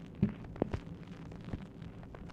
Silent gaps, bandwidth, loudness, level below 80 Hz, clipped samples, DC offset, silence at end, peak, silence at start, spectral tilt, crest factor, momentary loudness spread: none; 8.4 kHz; -42 LUFS; -52 dBFS; under 0.1%; under 0.1%; 0 s; -14 dBFS; 0 s; -9 dB/octave; 26 dB; 12 LU